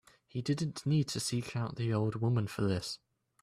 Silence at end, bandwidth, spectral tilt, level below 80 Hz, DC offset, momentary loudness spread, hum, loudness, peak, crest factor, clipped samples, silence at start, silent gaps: 0.45 s; 14.5 kHz; -6 dB/octave; -64 dBFS; under 0.1%; 8 LU; none; -34 LUFS; -20 dBFS; 14 dB; under 0.1%; 0.35 s; none